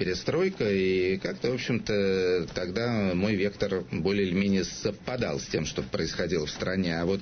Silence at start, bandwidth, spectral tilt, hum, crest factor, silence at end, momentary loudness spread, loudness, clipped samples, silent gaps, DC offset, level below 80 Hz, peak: 0 s; 6.6 kHz; -5.5 dB/octave; none; 16 dB; 0 s; 5 LU; -28 LUFS; under 0.1%; none; under 0.1%; -50 dBFS; -12 dBFS